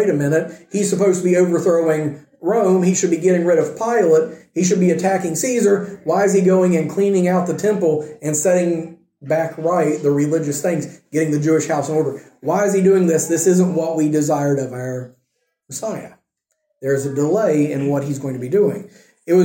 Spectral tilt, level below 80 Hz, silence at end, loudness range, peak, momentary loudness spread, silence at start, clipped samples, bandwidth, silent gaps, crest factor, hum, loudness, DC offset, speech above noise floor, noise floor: -6 dB/octave; -66 dBFS; 0 s; 5 LU; -4 dBFS; 10 LU; 0 s; under 0.1%; 17 kHz; none; 14 dB; none; -18 LUFS; under 0.1%; 56 dB; -73 dBFS